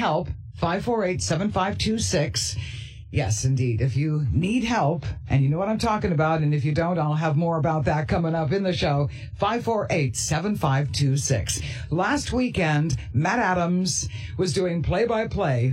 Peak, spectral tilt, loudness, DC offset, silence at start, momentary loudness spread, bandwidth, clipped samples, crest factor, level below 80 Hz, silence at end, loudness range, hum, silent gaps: -8 dBFS; -5.5 dB/octave; -24 LUFS; under 0.1%; 0 s; 5 LU; 12.5 kHz; under 0.1%; 14 dB; -42 dBFS; 0 s; 1 LU; none; none